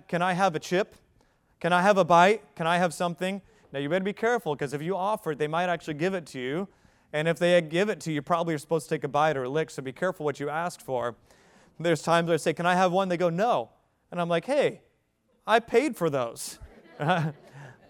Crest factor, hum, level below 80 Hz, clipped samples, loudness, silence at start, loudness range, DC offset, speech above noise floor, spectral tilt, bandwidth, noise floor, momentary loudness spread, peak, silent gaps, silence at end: 20 dB; none; -66 dBFS; under 0.1%; -27 LUFS; 0.1 s; 5 LU; under 0.1%; 44 dB; -5.5 dB/octave; 17 kHz; -70 dBFS; 11 LU; -6 dBFS; none; 0.2 s